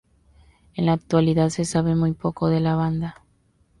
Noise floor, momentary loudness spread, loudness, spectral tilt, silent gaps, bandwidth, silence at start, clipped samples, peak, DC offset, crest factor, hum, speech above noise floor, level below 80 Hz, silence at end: -62 dBFS; 7 LU; -22 LUFS; -7 dB/octave; none; 11.5 kHz; 0.75 s; under 0.1%; -8 dBFS; under 0.1%; 16 dB; none; 41 dB; -48 dBFS; 0.7 s